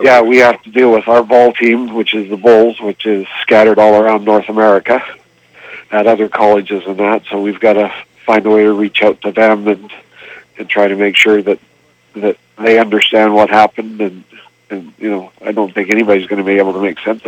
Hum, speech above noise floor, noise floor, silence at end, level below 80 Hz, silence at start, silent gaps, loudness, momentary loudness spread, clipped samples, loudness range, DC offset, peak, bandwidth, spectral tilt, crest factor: none; 28 dB; -38 dBFS; 0 s; -58 dBFS; 0 s; none; -11 LUFS; 12 LU; 0.4%; 4 LU; under 0.1%; 0 dBFS; 16 kHz; -5 dB/octave; 12 dB